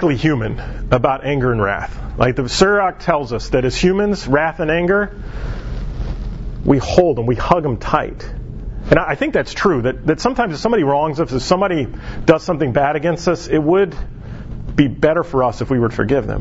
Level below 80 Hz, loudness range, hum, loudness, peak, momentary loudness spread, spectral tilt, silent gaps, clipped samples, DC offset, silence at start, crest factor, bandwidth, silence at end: -30 dBFS; 2 LU; none; -17 LUFS; 0 dBFS; 13 LU; -6.5 dB/octave; none; under 0.1%; under 0.1%; 0 s; 16 dB; 8 kHz; 0 s